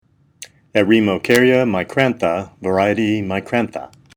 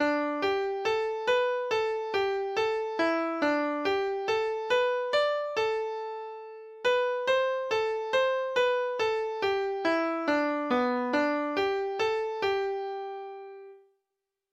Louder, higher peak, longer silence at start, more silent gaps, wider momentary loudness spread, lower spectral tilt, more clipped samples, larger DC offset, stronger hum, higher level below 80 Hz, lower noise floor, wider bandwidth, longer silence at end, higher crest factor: first, -17 LUFS vs -28 LUFS; first, 0 dBFS vs -16 dBFS; first, 0.4 s vs 0 s; neither; about the same, 8 LU vs 8 LU; first, -6 dB/octave vs -3.5 dB/octave; neither; neither; neither; first, -56 dBFS vs -68 dBFS; second, -42 dBFS vs -86 dBFS; first, over 20 kHz vs 8.6 kHz; second, 0.3 s vs 0.75 s; about the same, 18 dB vs 14 dB